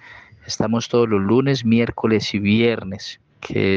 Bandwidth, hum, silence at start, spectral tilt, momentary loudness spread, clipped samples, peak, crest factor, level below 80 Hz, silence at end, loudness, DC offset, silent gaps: 7.4 kHz; none; 0.1 s; -6 dB/octave; 13 LU; under 0.1%; -4 dBFS; 16 dB; -52 dBFS; 0 s; -19 LUFS; under 0.1%; none